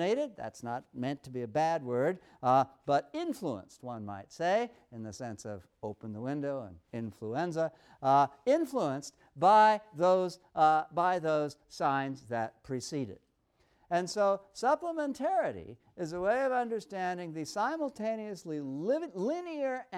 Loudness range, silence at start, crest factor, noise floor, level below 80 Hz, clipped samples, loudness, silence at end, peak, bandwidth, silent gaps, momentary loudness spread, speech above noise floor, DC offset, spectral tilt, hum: 9 LU; 0 s; 18 dB; -72 dBFS; -72 dBFS; under 0.1%; -32 LUFS; 0 s; -14 dBFS; 14 kHz; none; 15 LU; 40 dB; under 0.1%; -5.5 dB/octave; none